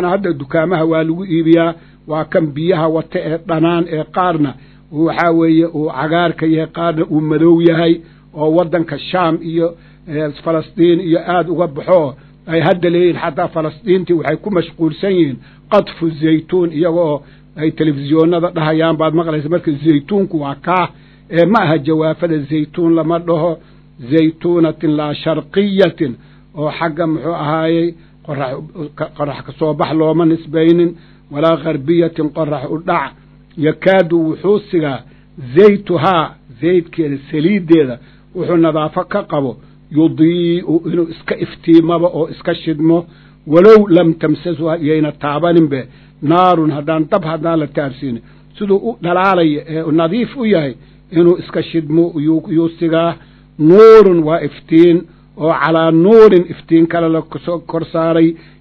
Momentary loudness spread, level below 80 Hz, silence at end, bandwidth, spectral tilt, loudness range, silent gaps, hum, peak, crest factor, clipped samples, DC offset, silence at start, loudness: 10 LU; -48 dBFS; 0.25 s; 6 kHz; -9.5 dB/octave; 5 LU; none; none; 0 dBFS; 14 dB; 0.6%; under 0.1%; 0 s; -14 LUFS